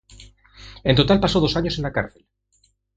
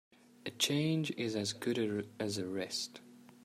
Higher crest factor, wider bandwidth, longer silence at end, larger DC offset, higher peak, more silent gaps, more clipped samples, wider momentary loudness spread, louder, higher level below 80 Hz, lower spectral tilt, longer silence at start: about the same, 22 dB vs 20 dB; second, 9.2 kHz vs 15.5 kHz; first, 0.9 s vs 0.15 s; neither; first, 0 dBFS vs -18 dBFS; neither; neither; about the same, 10 LU vs 12 LU; first, -20 LUFS vs -36 LUFS; first, -38 dBFS vs -78 dBFS; first, -6.5 dB/octave vs -4 dB/octave; second, 0.2 s vs 0.45 s